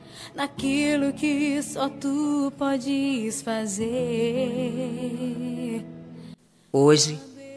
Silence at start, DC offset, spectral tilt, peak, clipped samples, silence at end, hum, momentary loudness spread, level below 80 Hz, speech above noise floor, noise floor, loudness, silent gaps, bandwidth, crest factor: 0 s; under 0.1%; -4.5 dB/octave; -6 dBFS; under 0.1%; 0 s; none; 12 LU; -60 dBFS; 23 dB; -47 dBFS; -25 LUFS; none; 11 kHz; 20 dB